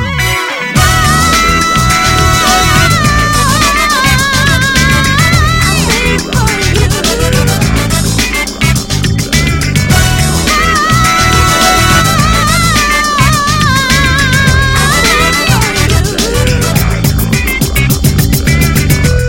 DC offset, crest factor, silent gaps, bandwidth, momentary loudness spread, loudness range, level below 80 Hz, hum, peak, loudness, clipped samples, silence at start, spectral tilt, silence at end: 0.4%; 8 dB; none; over 20 kHz; 4 LU; 3 LU; -18 dBFS; none; 0 dBFS; -8 LUFS; 1%; 0 s; -3.5 dB/octave; 0 s